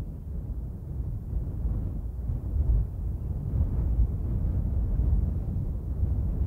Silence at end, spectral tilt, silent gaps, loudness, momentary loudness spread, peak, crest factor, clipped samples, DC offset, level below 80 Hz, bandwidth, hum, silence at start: 0 s; -11.5 dB/octave; none; -31 LUFS; 8 LU; -14 dBFS; 14 dB; under 0.1%; under 0.1%; -30 dBFS; 1.8 kHz; none; 0 s